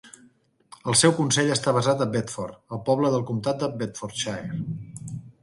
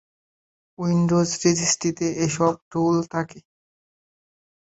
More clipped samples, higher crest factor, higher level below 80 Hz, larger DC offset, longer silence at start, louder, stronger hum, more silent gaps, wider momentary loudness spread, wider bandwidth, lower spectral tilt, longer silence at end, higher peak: neither; about the same, 20 dB vs 18 dB; about the same, -60 dBFS vs -60 dBFS; neither; second, 0.05 s vs 0.8 s; about the same, -24 LUFS vs -22 LUFS; neither; second, none vs 2.62-2.71 s; first, 16 LU vs 9 LU; first, 11.5 kHz vs 8.2 kHz; about the same, -4 dB/octave vs -5 dB/octave; second, 0.15 s vs 1.3 s; about the same, -4 dBFS vs -6 dBFS